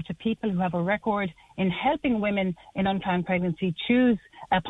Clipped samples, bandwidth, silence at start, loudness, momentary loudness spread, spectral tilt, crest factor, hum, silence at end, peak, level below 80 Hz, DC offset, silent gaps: under 0.1%; 4 kHz; 0 s; -26 LUFS; 7 LU; -8.5 dB/octave; 16 dB; none; 0 s; -10 dBFS; -54 dBFS; under 0.1%; none